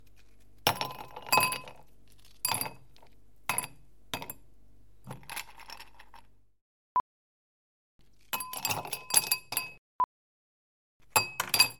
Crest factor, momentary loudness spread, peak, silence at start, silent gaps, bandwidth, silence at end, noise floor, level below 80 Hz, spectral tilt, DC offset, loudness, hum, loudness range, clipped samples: 28 dB; 21 LU; -6 dBFS; 0.65 s; 6.61-7.99 s, 9.78-11.00 s; 17 kHz; 0.05 s; -62 dBFS; -66 dBFS; -0.5 dB/octave; 0.3%; -31 LUFS; none; 10 LU; under 0.1%